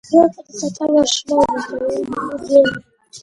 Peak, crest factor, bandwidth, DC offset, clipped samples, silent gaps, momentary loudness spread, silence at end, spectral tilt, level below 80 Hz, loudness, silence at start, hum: 0 dBFS; 16 dB; 11 kHz; under 0.1%; under 0.1%; none; 11 LU; 0.05 s; -3.5 dB/octave; -50 dBFS; -17 LUFS; 0.1 s; none